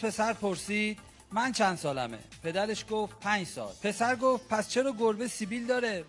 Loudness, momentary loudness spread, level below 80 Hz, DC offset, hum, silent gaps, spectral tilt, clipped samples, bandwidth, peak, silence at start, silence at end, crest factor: -31 LUFS; 7 LU; -62 dBFS; under 0.1%; none; none; -4 dB/octave; under 0.1%; 11.5 kHz; -12 dBFS; 0 s; 0 s; 18 dB